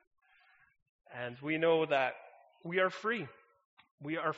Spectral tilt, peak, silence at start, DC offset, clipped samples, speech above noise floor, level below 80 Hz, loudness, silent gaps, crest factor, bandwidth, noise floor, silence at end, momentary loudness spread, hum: -3 dB/octave; -16 dBFS; 1.1 s; under 0.1%; under 0.1%; 34 dB; -82 dBFS; -33 LUFS; 3.65-3.77 s, 3.91-3.98 s; 20 dB; 7.6 kHz; -67 dBFS; 0 s; 19 LU; none